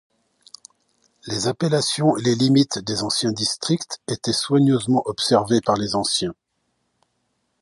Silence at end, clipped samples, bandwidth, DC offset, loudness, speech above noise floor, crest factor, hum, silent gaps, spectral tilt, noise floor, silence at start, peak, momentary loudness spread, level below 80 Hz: 1.3 s; under 0.1%; 11.5 kHz; under 0.1%; -20 LUFS; 52 dB; 18 dB; none; none; -4.5 dB/octave; -72 dBFS; 1.25 s; -2 dBFS; 7 LU; -56 dBFS